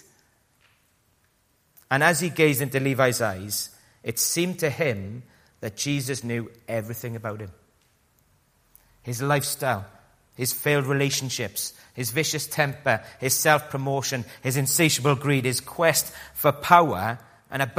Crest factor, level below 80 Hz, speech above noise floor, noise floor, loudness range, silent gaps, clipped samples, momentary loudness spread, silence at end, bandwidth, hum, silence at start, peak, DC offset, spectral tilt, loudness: 24 dB; -62 dBFS; 42 dB; -66 dBFS; 10 LU; none; under 0.1%; 14 LU; 0 s; 15.5 kHz; none; 1.9 s; 0 dBFS; under 0.1%; -4 dB/octave; -24 LUFS